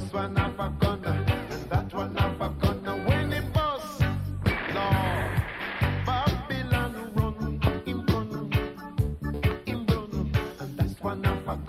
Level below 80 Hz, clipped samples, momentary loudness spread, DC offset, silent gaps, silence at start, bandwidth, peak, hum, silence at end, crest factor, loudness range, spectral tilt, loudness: -36 dBFS; under 0.1%; 4 LU; under 0.1%; none; 0 s; 15.5 kHz; -10 dBFS; none; 0 s; 18 dB; 2 LU; -7 dB/octave; -28 LUFS